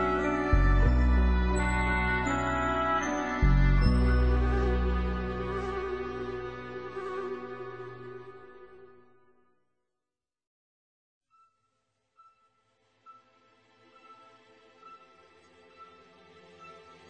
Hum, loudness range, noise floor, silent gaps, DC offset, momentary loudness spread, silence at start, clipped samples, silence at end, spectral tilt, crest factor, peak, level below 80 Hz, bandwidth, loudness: none; 16 LU; under -90 dBFS; 10.47-11.21 s; under 0.1%; 19 LU; 0 s; under 0.1%; 0.2 s; -7 dB/octave; 20 dB; -10 dBFS; -32 dBFS; 8.4 kHz; -29 LUFS